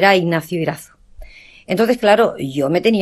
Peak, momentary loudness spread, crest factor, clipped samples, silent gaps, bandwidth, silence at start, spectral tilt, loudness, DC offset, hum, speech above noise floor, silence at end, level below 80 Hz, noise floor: 0 dBFS; 10 LU; 16 dB; under 0.1%; none; 13 kHz; 0 s; -5.5 dB/octave; -17 LUFS; under 0.1%; none; 23 dB; 0 s; -46 dBFS; -38 dBFS